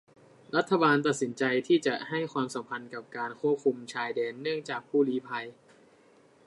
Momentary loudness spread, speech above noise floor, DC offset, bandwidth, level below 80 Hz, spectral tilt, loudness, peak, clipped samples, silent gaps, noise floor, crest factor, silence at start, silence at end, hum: 13 LU; 31 dB; under 0.1%; 11.5 kHz; -80 dBFS; -5 dB/octave; -29 LUFS; -10 dBFS; under 0.1%; none; -60 dBFS; 20 dB; 0.55 s; 0.95 s; none